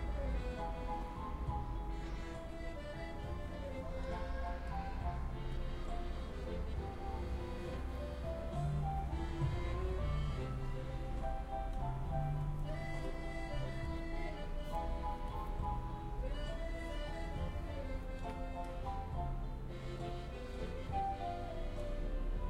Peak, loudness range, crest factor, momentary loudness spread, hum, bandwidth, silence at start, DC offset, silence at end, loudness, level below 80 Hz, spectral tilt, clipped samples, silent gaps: -24 dBFS; 4 LU; 14 dB; 6 LU; none; 11.5 kHz; 0 s; under 0.1%; 0 s; -43 LUFS; -42 dBFS; -7 dB/octave; under 0.1%; none